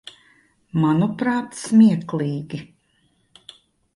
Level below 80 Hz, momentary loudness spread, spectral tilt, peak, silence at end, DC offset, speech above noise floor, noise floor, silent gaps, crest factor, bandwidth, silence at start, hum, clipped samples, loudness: -62 dBFS; 15 LU; -7 dB/octave; -4 dBFS; 1.3 s; under 0.1%; 45 dB; -64 dBFS; none; 18 dB; 11.5 kHz; 0.75 s; none; under 0.1%; -20 LUFS